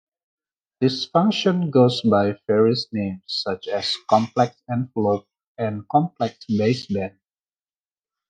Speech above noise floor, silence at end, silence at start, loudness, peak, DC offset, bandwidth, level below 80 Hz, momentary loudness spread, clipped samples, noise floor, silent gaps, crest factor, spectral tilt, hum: over 69 dB; 1.2 s; 0.8 s; -22 LUFS; -4 dBFS; under 0.1%; 9.4 kHz; -68 dBFS; 10 LU; under 0.1%; under -90 dBFS; 5.47-5.55 s; 20 dB; -6.5 dB/octave; none